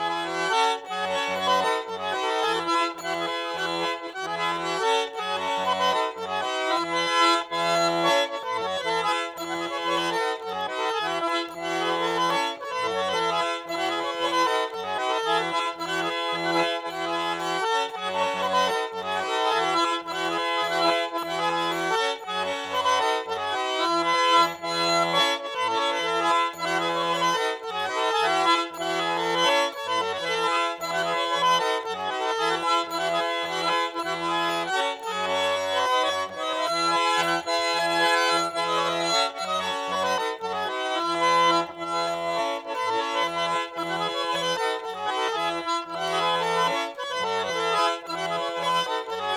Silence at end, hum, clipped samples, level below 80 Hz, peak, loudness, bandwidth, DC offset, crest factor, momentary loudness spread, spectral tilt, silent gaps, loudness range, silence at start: 0 s; none; under 0.1%; -74 dBFS; -8 dBFS; -25 LUFS; 18.5 kHz; under 0.1%; 18 dB; 6 LU; -2.5 dB/octave; none; 3 LU; 0 s